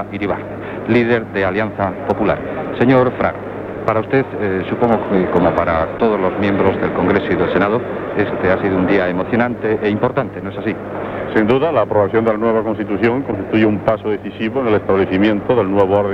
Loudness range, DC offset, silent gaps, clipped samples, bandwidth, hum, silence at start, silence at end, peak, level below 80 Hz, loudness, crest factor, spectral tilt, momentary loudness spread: 1 LU; under 0.1%; none; under 0.1%; 6.6 kHz; none; 0 s; 0 s; -2 dBFS; -42 dBFS; -17 LUFS; 14 dB; -9 dB/octave; 8 LU